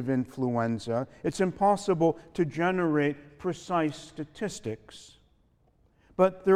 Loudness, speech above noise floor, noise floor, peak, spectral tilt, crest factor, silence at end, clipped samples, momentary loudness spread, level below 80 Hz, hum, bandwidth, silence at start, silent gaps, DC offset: -29 LUFS; 38 dB; -66 dBFS; -10 dBFS; -6.5 dB/octave; 20 dB; 0 s; under 0.1%; 14 LU; -60 dBFS; none; 13 kHz; 0 s; none; under 0.1%